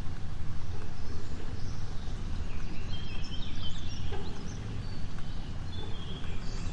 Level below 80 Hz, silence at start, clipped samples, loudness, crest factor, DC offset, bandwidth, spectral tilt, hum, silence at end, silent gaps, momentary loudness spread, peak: -38 dBFS; 0 s; under 0.1%; -40 LUFS; 10 dB; under 0.1%; 7.8 kHz; -5.5 dB/octave; none; 0 s; none; 2 LU; -16 dBFS